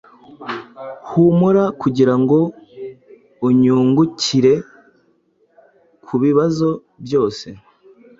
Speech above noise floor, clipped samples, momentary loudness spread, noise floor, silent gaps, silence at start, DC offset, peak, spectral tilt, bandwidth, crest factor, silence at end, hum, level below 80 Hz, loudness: 44 dB; under 0.1%; 20 LU; -59 dBFS; none; 0.4 s; under 0.1%; -2 dBFS; -7 dB/octave; 7.8 kHz; 16 dB; 0.65 s; none; -56 dBFS; -16 LUFS